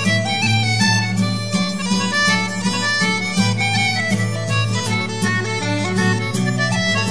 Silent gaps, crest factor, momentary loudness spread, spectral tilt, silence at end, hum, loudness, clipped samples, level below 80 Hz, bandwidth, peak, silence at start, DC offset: none; 14 dB; 4 LU; -4 dB/octave; 0 s; none; -18 LUFS; under 0.1%; -52 dBFS; 11 kHz; -4 dBFS; 0 s; 1%